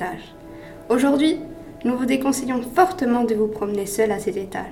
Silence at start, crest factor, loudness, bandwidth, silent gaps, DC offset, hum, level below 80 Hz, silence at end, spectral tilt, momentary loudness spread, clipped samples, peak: 0 s; 20 dB; -21 LUFS; 18 kHz; none; under 0.1%; none; -50 dBFS; 0 s; -4.5 dB/octave; 18 LU; under 0.1%; -2 dBFS